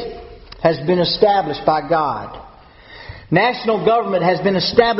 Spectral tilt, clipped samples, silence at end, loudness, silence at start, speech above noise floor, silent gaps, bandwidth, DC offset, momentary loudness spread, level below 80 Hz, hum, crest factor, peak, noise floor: -3.5 dB/octave; under 0.1%; 0 s; -17 LUFS; 0 s; 26 dB; none; 6 kHz; under 0.1%; 21 LU; -46 dBFS; none; 18 dB; 0 dBFS; -42 dBFS